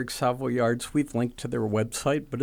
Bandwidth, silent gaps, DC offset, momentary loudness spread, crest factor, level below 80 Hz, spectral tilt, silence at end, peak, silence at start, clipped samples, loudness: 19 kHz; none; under 0.1%; 4 LU; 14 dB; -52 dBFS; -5.5 dB/octave; 0 s; -12 dBFS; 0 s; under 0.1%; -27 LUFS